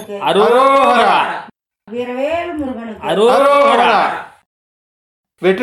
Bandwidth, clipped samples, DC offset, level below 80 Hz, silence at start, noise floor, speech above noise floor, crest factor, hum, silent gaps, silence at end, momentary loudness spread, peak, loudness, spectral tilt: 14 kHz; under 0.1%; under 0.1%; -54 dBFS; 0 s; under -90 dBFS; over 77 dB; 14 dB; none; 4.46-5.24 s; 0 s; 14 LU; 0 dBFS; -13 LUFS; -4.5 dB/octave